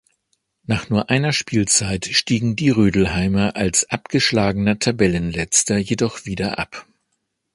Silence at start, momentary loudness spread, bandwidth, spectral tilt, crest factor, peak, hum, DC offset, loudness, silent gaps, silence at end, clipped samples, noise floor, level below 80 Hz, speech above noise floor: 0.7 s; 8 LU; 11.5 kHz; -4 dB/octave; 20 dB; 0 dBFS; none; under 0.1%; -19 LUFS; none; 0.75 s; under 0.1%; -73 dBFS; -40 dBFS; 55 dB